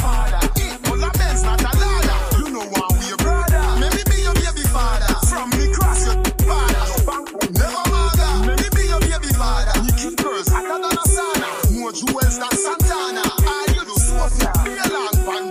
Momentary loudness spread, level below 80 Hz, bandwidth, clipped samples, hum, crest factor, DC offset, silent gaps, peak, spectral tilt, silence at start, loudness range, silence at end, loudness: 3 LU; -18 dBFS; 16 kHz; under 0.1%; none; 14 dB; under 0.1%; none; -2 dBFS; -4 dB/octave; 0 s; 1 LU; 0 s; -19 LUFS